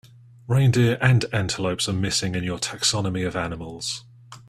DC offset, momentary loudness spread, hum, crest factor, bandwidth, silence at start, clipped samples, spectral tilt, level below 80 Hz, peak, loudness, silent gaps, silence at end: under 0.1%; 11 LU; none; 20 dB; 13.5 kHz; 0.45 s; under 0.1%; -4.5 dB/octave; -50 dBFS; -4 dBFS; -23 LUFS; none; 0.1 s